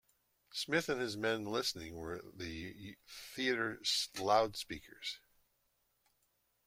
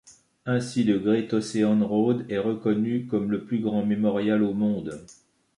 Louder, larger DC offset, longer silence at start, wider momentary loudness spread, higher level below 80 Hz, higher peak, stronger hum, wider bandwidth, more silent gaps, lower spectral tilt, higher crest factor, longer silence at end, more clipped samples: second, -37 LUFS vs -25 LUFS; neither; first, 0.55 s vs 0.05 s; first, 16 LU vs 6 LU; second, -68 dBFS vs -62 dBFS; second, -16 dBFS vs -10 dBFS; neither; first, 16.5 kHz vs 11 kHz; neither; second, -3 dB/octave vs -7 dB/octave; first, 24 dB vs 14 dB; first, 1.5 s vs 0.45 s; neither